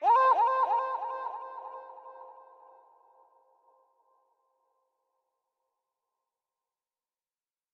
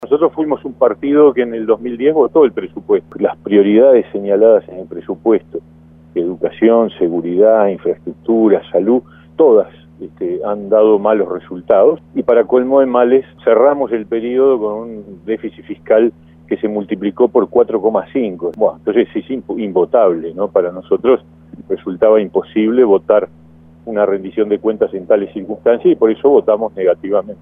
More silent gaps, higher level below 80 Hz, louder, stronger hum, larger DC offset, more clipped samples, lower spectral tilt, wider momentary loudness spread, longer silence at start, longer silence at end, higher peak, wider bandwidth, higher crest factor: neither; second, under -90 dBFS vs -52 dBFS; second, -27 LUFS vs -14 LUFS; neither; neither; neither; second, 0 dB/octave vs -10 dB/octave; first, 26 LU vs 12 LU; about the same, 0 s vs 0 s; first, 5.4 s vs 0.1 s; second, -14 dBFS vs 0 dBFS; first, 6.2 kHz vs 3.7 kHz; first, 20 dB vs 14 dB